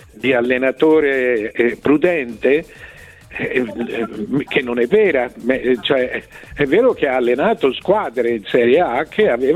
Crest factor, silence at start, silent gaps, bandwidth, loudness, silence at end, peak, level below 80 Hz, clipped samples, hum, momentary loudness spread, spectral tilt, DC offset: 14 dB; 0.15 s; none; 12.5 kHz; -17 LUFS; 0 s; -2 dBFS; -48 dBFS; under 0.1%; none; 9 LU; -6.5 dB/octave; under 0.1%